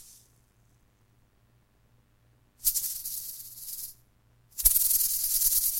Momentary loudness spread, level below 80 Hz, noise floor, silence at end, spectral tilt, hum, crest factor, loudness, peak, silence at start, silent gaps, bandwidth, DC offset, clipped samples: 18 LU; -50 dBFS; -65 dBFS; 0 s; 1.5 dB/octave; none; 28 dB; -25 LUFS; -2 dBFS; 0 s; none; 17 kHz; under 0.1%; under 0.1%